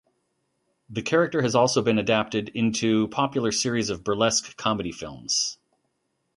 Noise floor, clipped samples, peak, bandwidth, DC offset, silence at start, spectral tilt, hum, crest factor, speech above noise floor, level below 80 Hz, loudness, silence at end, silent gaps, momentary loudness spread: -75 dBFS; under 0.1%; -6 dBFS; 11.5 kHz; under 0.1%; 0.9 s; -4 dB/octave; none; 20 dB; 51 dB; -58 dBFS; -24 LUFS; 0.85 s; none; 8 LU